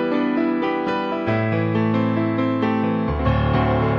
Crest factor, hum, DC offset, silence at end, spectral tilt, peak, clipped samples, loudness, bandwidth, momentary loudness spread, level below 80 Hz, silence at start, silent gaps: 14 dB; none; under 0.1%; 0 s; -9 dB/octave; -6 dBFS; under 0.1%; -21 LUFS; 6 kHz; 3 LU; -34 dBFS; 0 s; none